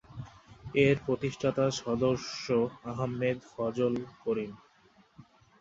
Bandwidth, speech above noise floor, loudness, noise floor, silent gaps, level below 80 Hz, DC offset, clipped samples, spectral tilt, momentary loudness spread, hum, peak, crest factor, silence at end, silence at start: 7.8 kHz; 33 dB; -31 LUFS; -63 dBFS; none; -60 dBFS; under 0.1%; under 0.1%; -6 dB/octave; 13 LU; none; -10 dBFS; 22 dB; 0.4 s; 0.1 s